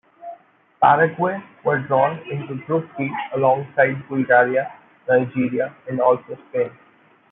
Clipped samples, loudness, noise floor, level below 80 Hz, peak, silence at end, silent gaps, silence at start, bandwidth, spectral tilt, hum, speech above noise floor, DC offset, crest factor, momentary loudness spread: under 0.1%; -20 LUFS; -48 dBFS; -68 dBFS; -2 dBFS; 0.6 s; none; 0.2 s; 3.9 kHz; -11.5 dB/octave; none; 28 dB; under 0.1%; 18 dB; 13 LU